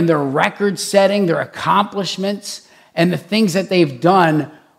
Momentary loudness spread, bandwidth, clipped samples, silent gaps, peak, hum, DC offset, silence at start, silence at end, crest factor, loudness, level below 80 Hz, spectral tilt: 9 LU; 15.5 kHz; under 0.1%; none; 0 dBFS; none; under 0.1%; 0 s; 0.3 s; 16 dB; -16 LUFS; -64 dBFS; -5.5 dB/octave